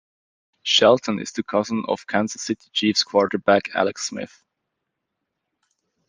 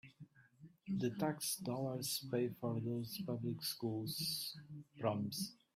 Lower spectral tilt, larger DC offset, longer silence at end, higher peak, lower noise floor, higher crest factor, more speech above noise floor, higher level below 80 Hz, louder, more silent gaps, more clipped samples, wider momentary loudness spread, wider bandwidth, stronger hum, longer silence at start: about the same, -3.5 dB/octave vs -4.5 dB/octave; neither; first, 1.8 s vs 0.2 s; first, -2 dBFS vs -24 dBFS; first, -80 dBFS vs -63 dBFS; about the same, 20 dB vs 18 dB; first, 59 dB vs 22 dB; first, -68 dBFS vs -78 dBFS; first, -21 LUFS vs -41 LUFS; neither; neither; first, 12 LU vs 6 LU; second, 10 kHz vs 16 kHz; neither; first, 0.65 s vs 0.05 s